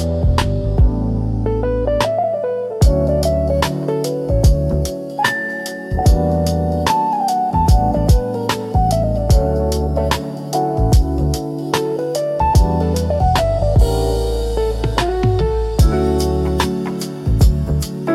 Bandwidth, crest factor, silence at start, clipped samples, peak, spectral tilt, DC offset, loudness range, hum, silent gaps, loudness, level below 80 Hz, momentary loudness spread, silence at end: 14.5 kHz; 14 dB; 0 s; under 0.1%; 0 dBFS; -6.5 dB/octave; under 0.1%; 1 LU; none; none; -17 LUFS; -20 dBFS; 5 LU; 0 s